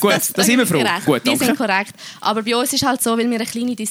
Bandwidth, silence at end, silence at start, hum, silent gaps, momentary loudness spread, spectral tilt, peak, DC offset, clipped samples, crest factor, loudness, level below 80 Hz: over 20 kHz; 0 s; 0 s; none; none; 7 LU; -3 dB/octave; -2 dBFS; under 0.1%; under 0.1%; 16 dB; -17 LUFS; -58 dBFS